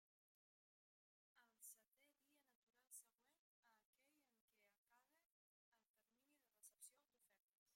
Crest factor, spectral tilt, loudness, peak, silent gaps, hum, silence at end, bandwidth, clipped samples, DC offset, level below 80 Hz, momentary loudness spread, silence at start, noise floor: 26 dB; 1 dB/octave; -65 LUFS; -50 dBFS; 2.55-2.67 s, 3.39-3.63 s, 3.85-3.93 s, 4.41-4.48 s, 4.78-4.85 s, 5.26-5.72 s, 5.89-5.94 s, 7.40-7.66 s; none; 0 s; 16 kHz; under 0.1%; under 0.1%; under -90 dBFS; 3 LU; 1.35 s; under -90 dBFS